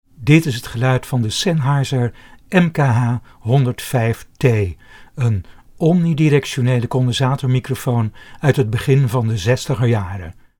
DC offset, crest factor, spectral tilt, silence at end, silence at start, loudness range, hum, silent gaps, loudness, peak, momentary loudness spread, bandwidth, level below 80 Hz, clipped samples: under 0.1%; 16 dB; -6.5 dB/octave; 0.25 s; 0.2 s; 1 LU; none; none; -17 LUFS; 0 dBFS; 7 LU; 17.5 kHz; -44 dBFS; under 0.1%